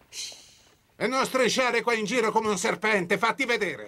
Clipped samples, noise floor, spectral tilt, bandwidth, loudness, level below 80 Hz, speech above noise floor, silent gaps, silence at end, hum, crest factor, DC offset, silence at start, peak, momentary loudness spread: under 0.1%; -59 dBFS; -3 dB/octave; 16 kHz; -25 LUFS; -66 dBFS; 33 dB; none; 0 s; none; 16 dB; under 0.1%; 0.1 s; -10 dBFS; 8 LU